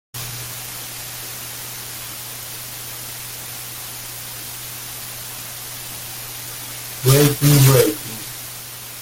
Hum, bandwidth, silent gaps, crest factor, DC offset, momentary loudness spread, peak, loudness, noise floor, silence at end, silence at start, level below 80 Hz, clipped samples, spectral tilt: none; 17 kHz; none; 22 dB; under 0.1%; 15 LU; 0 dBFS; -22 LUFS; -34 dBFS; 0 s; 0.15 s; -48 dBFS; under 0.1%; -4.5 dB/octave